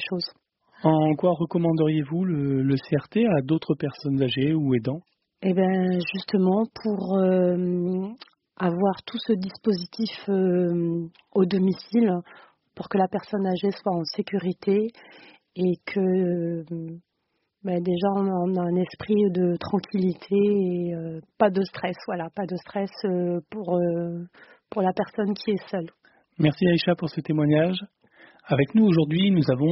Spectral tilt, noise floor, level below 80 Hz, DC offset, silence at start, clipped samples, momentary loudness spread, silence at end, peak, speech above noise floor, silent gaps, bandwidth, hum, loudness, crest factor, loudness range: -6.5 dB/octave; -76 dBFS; -64 dBFS; under 0.1%; 0 s; under 0.1%; 10 LU; 0 s; -6 dBFS; 52 dB; none; 6 kHz; none; -25 LUFS; 18 dB; 4 LU